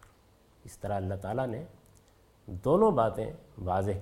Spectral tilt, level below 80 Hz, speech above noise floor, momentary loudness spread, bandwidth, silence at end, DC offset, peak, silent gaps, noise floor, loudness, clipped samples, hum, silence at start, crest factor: -8 dB/octave; -56 dBFS; 32 dB; 18 LU; 16 kHz; 0 s; under 0.1%; -12 dBFS; none; -62 dBFS; -30 LUFS; under 0.1%; none; 0.65 s; 20 dB